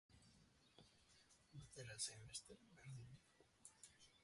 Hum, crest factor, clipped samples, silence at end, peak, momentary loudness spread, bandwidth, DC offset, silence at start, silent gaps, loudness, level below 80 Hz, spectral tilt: none; 26 dB; under 0.1%; 0 s; -34 dBFS; 17 LU; 11.5 kHz; under 0.1%; 0.1 s; none; -56 LUFS; -80 dBFS; -2 dB/octave